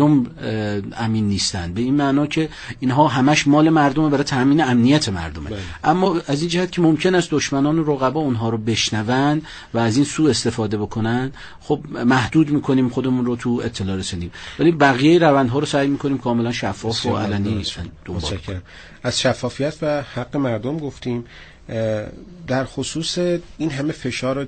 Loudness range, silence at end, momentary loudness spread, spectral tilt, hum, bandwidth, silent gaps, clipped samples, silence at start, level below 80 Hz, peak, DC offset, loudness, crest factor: 7 LU; 0 s; 12 LU; -5.5 dB/octave; none; 9 kHz; none; under 0.1%; 0 s; -44 dBFS; 0 dBFS; under 0.1%; -19 LUFS; 18 dB